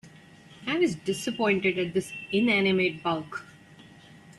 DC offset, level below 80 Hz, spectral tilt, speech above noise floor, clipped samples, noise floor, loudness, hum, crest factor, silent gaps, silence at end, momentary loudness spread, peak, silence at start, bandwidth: under 0.1%; -64 dBFS; -5 dB/octave; 25 dB; under 0.1%; -51 dBFS; -26 LUFS; none; 16 dB; none; 0.05 s; 10 LU; -12 dBFS; 0.05 s; 12.5 kHz